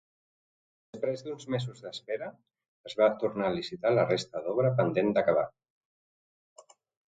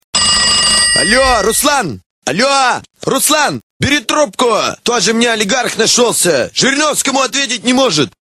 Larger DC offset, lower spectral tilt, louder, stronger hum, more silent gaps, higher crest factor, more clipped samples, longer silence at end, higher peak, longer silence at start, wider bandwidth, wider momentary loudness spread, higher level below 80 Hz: second, under 0.1% vs 0.1%; first, -6.5 dB/octave vs -2 dB/octave; second, -30 LUFS vs -11 LUFS; neither; second, 2.68-2.84 s vs 2.06-2.22 s, 3.63-3.80 s; first, 20 dB vs 12 dB; neither; first, 1.6 s vs 0.15 s; second, -12 dBFS vs 0 dBFS; first, 0.95 s vs 0.15 s; second, 9.2 kHz vs 16 kHz; first, 12 LU vs 7 LU; second, -68 dBFS vs -38 dBFS